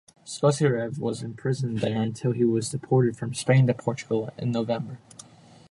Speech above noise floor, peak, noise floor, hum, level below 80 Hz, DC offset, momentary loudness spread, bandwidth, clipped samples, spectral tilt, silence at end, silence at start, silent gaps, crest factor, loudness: 26 dB; -8 dBFS; -51 dBFS; none; -62 dBFS; under 0.1%; 10 LU; 11.5 kHz; under 0.1%; -6.5 dB/octave; 0.75 s; 0.25 s; none; 18 dB; -26 LUFS